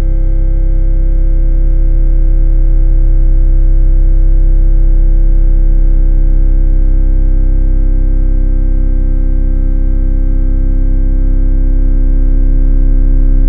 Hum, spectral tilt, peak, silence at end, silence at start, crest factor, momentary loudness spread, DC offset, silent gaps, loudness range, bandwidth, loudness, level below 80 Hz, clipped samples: none; -12.5 dB/octave; 0 dBFS; 0 s; 0 s; 6 dB; 2 LU; under 0.1%; none; 2 LU; 1.7 kHz; -14 LUFS; -6 dBFS; under 0.1%